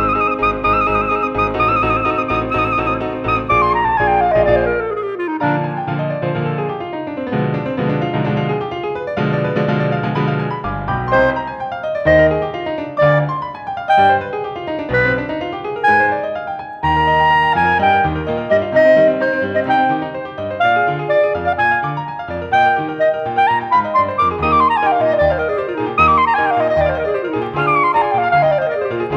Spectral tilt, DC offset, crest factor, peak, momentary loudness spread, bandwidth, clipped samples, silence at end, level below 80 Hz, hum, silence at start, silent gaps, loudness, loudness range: -8 dB/octave; under 0.1%; 16 dB; 0 dBFS; 10 LU; 7 kHz; under 0.1%; 0 s; -36 dBFS; none; 0 s; none; -16 LUFS; 4 LU